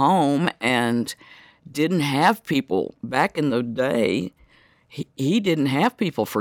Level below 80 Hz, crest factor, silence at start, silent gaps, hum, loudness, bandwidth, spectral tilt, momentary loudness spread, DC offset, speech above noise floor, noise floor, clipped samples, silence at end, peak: -64 dBFS; 18 dB; 0 s; none; none; -22 LUFS; 18.5 kHz; -5.5 dB/octave; 13 LU; under 0.1%; 34 dB; -56 dBFS; under 0.1%; 0 s; -4 dBFS